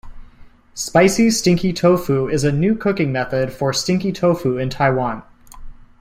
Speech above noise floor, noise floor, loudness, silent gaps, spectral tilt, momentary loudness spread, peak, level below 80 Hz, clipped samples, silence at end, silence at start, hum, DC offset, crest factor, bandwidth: 26 dB; -43 dBFS; -18 LUFS; none; -5.5 dB/octave; 7 LU; -2 dBFS; -42 dBFS; under 0.1%; 0.3 s; 0.05 s; none; under 0.1%; 16 dB; 16 kHz